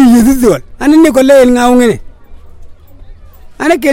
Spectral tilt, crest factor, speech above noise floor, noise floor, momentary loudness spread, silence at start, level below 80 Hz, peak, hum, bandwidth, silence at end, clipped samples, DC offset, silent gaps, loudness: -5 dB/octave; 8 dB; 25 dB; -31 dBFS; 7 LU; 0 s; -30 dBFS; 0 dBFS; none; 17 kHz; 0 s; 1%; under 0.1%; none; -7 LUFS